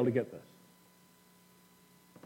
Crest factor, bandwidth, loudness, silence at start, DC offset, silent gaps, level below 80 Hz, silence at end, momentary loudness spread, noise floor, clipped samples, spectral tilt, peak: 22 dB; 16.5 kHz; -37 LUFS; 0 s; under 0.1%; none; -84 dBFS; 1.85 s; 26 LU; -63 dBFS; under 0.1%; -8 dB/octave; -18 dBFS